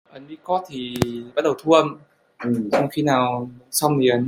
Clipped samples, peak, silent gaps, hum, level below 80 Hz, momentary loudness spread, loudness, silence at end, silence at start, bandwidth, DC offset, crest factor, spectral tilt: under 0.1%; -2 dBFS; none; none; -56 dBFS; 12 LU; -21 LUFS; 0 s; 0.15 s; 16.5 kHz; under 0.1%; 20 dB; -5 dB/octave